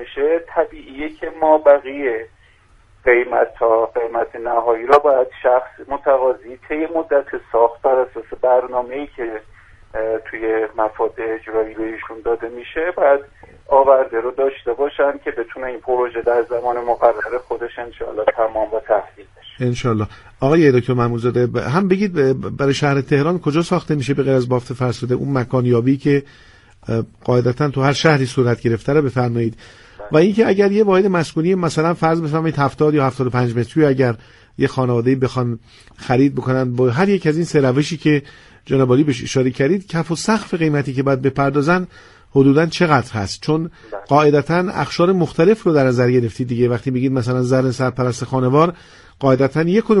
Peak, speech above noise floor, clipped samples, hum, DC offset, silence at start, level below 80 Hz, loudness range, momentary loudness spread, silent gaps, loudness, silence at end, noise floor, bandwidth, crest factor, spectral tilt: 0 dBFS; 34 dB; under 0.1%; none; under 0.1%; 0 s; -48 dBFS; 4 LU; 10 LU; none; -17 LUFS; 0 s; -51 dBFS; 11.5 kHz; 18 dB; -7 dB/octave